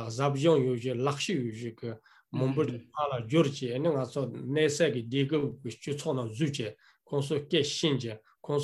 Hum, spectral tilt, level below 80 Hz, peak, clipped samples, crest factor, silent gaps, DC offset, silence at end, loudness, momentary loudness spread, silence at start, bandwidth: none; -5.5 dB/octave; -72 dBFS; -12 dBFS; under 0.1%; 18 dB; none; under 0.1%; 0 s; -30 LUFS; 12 LU; 0 s; 12 kHz